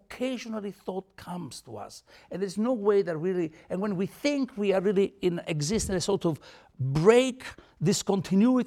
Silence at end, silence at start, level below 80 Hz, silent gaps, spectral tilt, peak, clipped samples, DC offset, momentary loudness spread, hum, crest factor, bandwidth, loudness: 0 s; 0.1 s; -54 dBFS; none; -5.5 dB/octave; -8 dBFS; under 0.1%; under 0.1%; 17 LU; none; 20 dB; 15.5 kHz; -27 LUFS